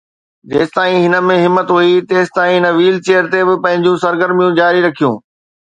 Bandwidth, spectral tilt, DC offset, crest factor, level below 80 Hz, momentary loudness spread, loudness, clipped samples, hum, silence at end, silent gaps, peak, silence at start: 9 kHz; -6 dB/octave; under 0.1%; 12 dB; -58 dBFS; 5 LU; -12 LUFS; under 0.1%; none; 0.5 s; none; 0 dBFS; 0.5 s